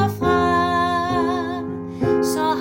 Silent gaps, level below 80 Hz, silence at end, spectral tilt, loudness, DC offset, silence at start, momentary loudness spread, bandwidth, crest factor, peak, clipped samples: none; -48 dBFS; 0 s; -5.5 dB/octave; -20 LUFS; under 0.1%; 0 s; 8 LU; 16.5 kHz; 14 dB; -6 dBFS; under 0.1%